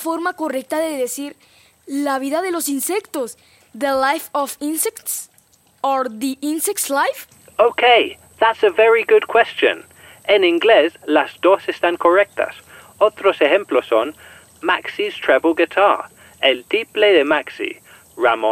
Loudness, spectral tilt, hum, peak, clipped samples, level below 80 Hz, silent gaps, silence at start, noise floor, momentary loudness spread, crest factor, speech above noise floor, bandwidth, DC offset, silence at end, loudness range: -17 LUFS; -1.5 dB/octave; none; -2 dBFS; under 0.1%; -64 dBFS; none; 0 s; -55 dBFS; 12 LU; 16 dB; 38 dB; 16.5 kHz; under 0.1%; 0 s; 7 LU